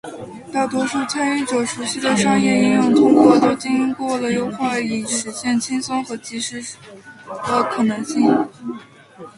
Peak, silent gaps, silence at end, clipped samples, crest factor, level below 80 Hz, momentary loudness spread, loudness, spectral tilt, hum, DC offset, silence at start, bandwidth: 0 dBFS; none; 0.1 s; under 0.1%; 18 dB; -58 dBFS; 17 LU; -18 LUFS; -4.5 dB/octave; none; under 0.1%; 0.05 s; 11.5 kHz